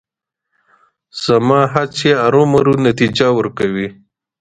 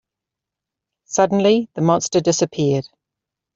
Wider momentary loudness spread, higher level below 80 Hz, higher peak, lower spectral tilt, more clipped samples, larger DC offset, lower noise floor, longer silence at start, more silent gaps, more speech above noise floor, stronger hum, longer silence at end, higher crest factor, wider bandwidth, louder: first, 11 LU vs 5 LU; first, -50 dBFS vs -60 dBFS; about the same, 0 dBFS vs -2 dBFS; about the same, -6 dB/octave vs -5 dB/octave; neither; neither; second, -77 dBFS vs -85 dBFS; about the same, 1.15 s vs 1.1 s; neither; second, 64 dB vs 68 dB; neither; second, 0.5 s vs 0.75 s; about the same, 14 dB vs 18 dB; first, 9.4 kHz vs 7.8 kHz; first, -14 LUFS vs -18 LUFS